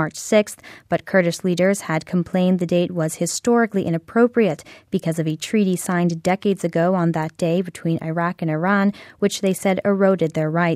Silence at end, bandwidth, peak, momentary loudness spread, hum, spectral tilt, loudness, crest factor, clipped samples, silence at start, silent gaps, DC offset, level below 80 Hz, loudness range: 0 s; 15 kHz; -4 dBFS; 6 LU; none; -6 dB/octave; -20 LUFS; 16 dB; under 0.1%; 0 s; none; under 0.1%; -60 dBFS; 1 LU